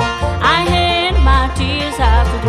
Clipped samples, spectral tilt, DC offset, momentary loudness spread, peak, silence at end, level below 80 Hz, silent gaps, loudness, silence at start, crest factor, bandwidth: under 0.1%; -5 dB/octave; under 0.1%; 5 LU; 0 dBFS; 0 s; -16 dBFS; none; -14 LUFS; 0 s; 14 dB; 11.5 kHz